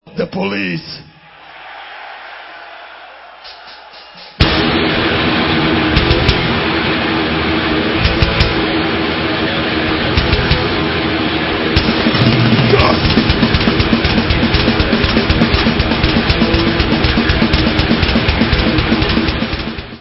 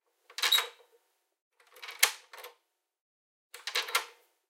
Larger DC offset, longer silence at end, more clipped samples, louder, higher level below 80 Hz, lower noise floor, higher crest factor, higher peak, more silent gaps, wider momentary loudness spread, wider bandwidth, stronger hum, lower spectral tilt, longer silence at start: neither; second, 0 s vs 0.4 s; neither; first, -13 LUFS vs -29 LUFS; first, -22 dBFS vs under -90 dBFS; second, -38 dBFS vs -74 dBFS; second, 14 dB vs 34 dB; about the same, 0 dBFS vs -2 dBFS; second, none vs 1.42-1.51 s, 3.01-3.50 s; second, 19 LU vs 23 LU; second, 8 kHz vs 17 kHz; neither; first, -8 dB/octave vs 6 dB/octave; second, 0.05 s vs 0.4 s